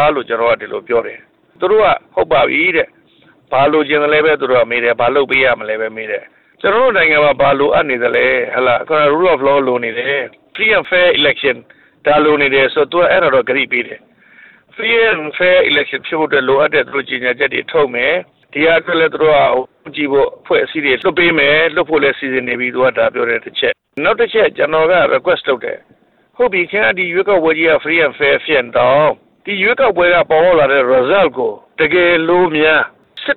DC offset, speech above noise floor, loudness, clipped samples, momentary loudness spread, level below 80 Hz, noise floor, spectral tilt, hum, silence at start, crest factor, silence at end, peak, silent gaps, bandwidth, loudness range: under 0.1%; 37 dB; -13 LUFS; under 0.1%; 8 LU; -48 dBFS; -49 dBFS; -7.5 dB/octave; none; 0 s; 12 dB; 0 s; -2 dBFS; none; 4.4 kHz; 2 LU